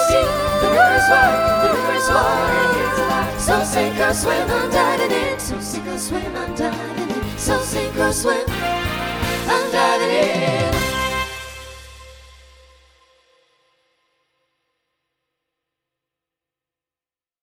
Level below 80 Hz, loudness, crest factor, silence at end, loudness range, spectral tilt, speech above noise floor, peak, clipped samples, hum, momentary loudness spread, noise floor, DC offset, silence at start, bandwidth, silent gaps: -36 dBFS; -18 LUFS; 20 dB; 5.3 s; 7 LU; -3.5 dB/octave; over 72 dB; 0 dBFS; under 0.1%; none; 11 LU; under -90 dBFS; under 0.1%; 0 s; 19.5 kHz; none